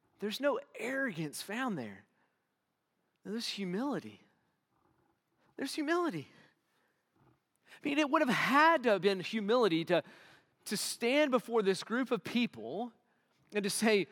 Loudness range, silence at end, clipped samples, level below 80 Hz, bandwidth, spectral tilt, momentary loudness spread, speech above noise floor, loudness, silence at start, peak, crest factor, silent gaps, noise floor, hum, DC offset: 11 LU; 0.05 s; under 0.1%; under -90 dBFS; 18 kHz; -4 dB/octave; 13 LU; 50 dB; -33 LUFS; 0.2 s; -14 dBFS; 22 dB; none; -83 dBFS; none; under 0.1%